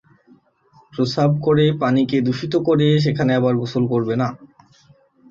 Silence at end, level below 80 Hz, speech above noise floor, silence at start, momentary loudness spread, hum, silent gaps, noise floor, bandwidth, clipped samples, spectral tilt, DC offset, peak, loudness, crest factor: 0.85 s; -56 dBFS; 37 dB; 0.95 s; 6 LU; none; none; -55 dBFS; 7.6 kHz; under 0.1%; -8 dB/octave; under 0.1%; -4 dBFS; -18 LUFS; 16 dB